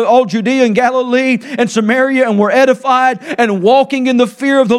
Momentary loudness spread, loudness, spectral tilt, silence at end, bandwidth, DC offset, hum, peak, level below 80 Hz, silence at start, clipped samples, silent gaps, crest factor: 4 LU; -12 LUFS; -5 dB/octave; 0 s; 12 kHz; under 0.1%; none; 0 dBFS; -60 dBFS; 0 s; under 0.1%; none; 12 dB